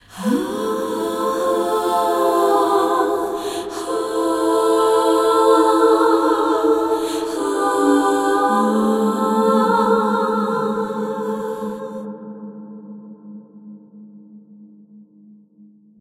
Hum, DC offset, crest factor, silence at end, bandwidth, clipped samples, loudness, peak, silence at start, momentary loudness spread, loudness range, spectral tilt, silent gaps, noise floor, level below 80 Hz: none; under 0.1%; 16 dB; 1 s; 16.5 kHz; under 0.1%; -18 LUFS; -2 dBFS; 0.1 s; 16 LU; 13 LU; -5 dB/octave; none; -49 dBFS; -58 dBFS